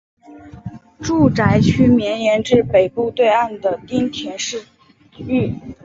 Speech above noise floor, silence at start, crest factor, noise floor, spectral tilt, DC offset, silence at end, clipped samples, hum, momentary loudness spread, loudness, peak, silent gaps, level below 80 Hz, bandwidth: 20 dB; 0.3 s; 16 dB; -36 dBFS; -6 dB/octave; under 0.1%; 0.1 s; under 0.1%; none; 18 LU; -17 LUFS; -2 dBFS; none; -40 dBFS; 7.8 kHz